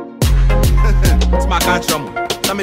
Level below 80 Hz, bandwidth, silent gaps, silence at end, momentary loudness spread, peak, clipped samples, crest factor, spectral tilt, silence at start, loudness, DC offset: -14 dBFS; 16.5 kHz; none; 0 s; 4 LU; -2 dBFS; under 0.1%; 12 dB; -4.5 dB/octave; 0 s; -15 LUFS; under 0.1%